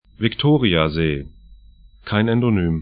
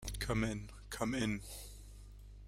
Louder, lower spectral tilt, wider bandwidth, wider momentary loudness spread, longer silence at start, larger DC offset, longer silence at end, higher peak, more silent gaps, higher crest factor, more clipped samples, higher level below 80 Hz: first, -19 LUFS vs -39 LUFS; first, -12 dB/octave vs -5 dB/octave; second, 5 kHz vs 16 kHz; second, 8 LU vs 20 LU; first, 0.2 s vs 0 s; neither; about the same, 0 s vs 0 s; first, 0 dBFS vs -20 dBFS; neither; about the same, 18 dB vs 20 dB; neither; first, -38 dBFS vs -50 dBFS